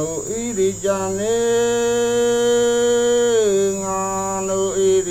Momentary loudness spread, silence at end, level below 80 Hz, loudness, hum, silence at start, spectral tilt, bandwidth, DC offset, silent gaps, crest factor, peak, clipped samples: 5 LU; 0 s; -46 dBFS; -18 LUFS; none; 0 s; -3.5 dB/octave; 16 kHz; under 0.1%; none; 10 dB; -8 dBFS; under 0.1%